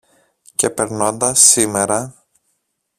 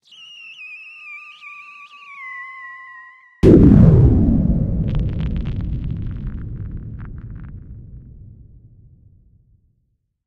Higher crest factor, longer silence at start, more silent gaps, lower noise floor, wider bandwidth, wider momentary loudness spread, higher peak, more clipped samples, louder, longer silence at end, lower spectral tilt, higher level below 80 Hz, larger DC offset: about the same, 18 dB vs 18 dB; first, 0.6 s vs 0.45 s; neither; about the same, -69 dBFS vs -68 dBFS; first, over 20 kHz vs 6.6 kHz; second, 13 LU vs 27 LU; about the same, 0 dBFS vs 0 dBFS; neither; about the same, -14 LUFS vs -15 LUFS; second, 0.9 s vs 2.3 s; second, -2 dB/octave vs -10 dB/octave; second, -54 dBFS vs -26 dBFS; neither